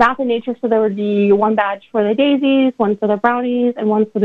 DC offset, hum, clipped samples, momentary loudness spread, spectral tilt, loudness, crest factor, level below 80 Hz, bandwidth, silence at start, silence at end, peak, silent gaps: under 0.1%; none; under 0.1%; 5 LU; -8 dB/octave; -16 LUFS; 14 dB; -58 dBFS; 7 kHz; 0 s; 0 s; 0 dBFS; none